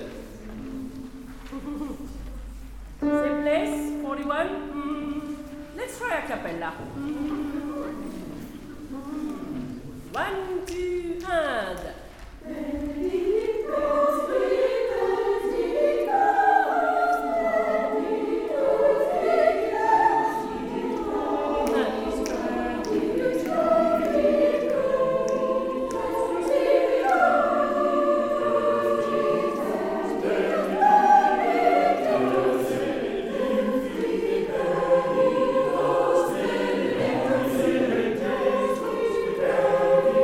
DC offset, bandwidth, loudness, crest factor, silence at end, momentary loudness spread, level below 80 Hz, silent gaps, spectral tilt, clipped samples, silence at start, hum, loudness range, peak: under 0.1%; 16.5 kHz; -24 LUFS; 18 dB; 0 s; 15 LU; -48 dBFS; none; -5.5 dB/octave; under 0.1%; 0 s; none; 10 LU; -6 dBFS